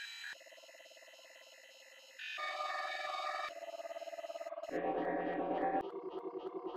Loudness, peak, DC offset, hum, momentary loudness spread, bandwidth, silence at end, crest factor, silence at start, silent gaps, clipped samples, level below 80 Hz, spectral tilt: -41 LUFS; -24 dBFS; under 0.1%; none; 19 LU; 14.5 kHz; 0 s; 18 dB; 0 s; none; under 0.1%; -74 dBFS; -4 dB/octave